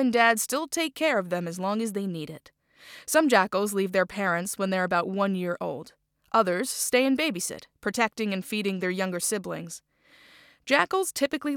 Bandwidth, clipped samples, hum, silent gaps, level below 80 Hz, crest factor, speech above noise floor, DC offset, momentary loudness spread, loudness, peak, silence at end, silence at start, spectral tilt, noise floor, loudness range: over 20 kHz; under 0.1%; none; none; -70 dBFS; 22 dB; 30 dB; under 0.1%; 12 LU; -26 LUFS; -4 dBFS; 0 s; 0 s; -3.5 dB/octave; -56 dBFS; 3 LU